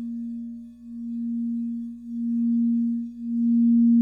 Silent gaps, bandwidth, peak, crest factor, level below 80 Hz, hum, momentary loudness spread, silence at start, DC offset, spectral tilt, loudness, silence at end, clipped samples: none; 0.6 kHz; -14 dBFS; 10 dB; -64 dBFS; 60 Hz at -65 dBFS; 17 LU; 0 s; under 0.1%; -10.5 dB/octave; -25 LUFS; 0 s; under 0.1%